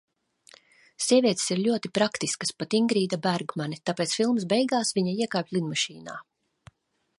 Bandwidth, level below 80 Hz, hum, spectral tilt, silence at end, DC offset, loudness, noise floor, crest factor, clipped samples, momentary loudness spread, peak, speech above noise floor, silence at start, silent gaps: 11.5 kHz; -72 dBFS; none; -4 dB/octave; 0.95 s; under 0.1%; -26 LUFS; -57 dBFS; 18 dB; under 0.1%; 8 LU; -8 dBFS; 31 dB; 1 s; none